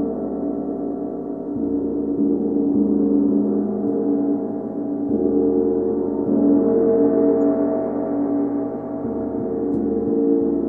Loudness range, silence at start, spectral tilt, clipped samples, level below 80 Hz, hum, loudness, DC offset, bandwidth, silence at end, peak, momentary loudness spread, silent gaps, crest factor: 3 LU; 0 s; -13 dB/octave; under 0.1%; -50 dBFS; none; -20 LUFS; 0.1%; 2.1 kHz; 0 s; -6 dBFS; 9 LU; none; 14 dB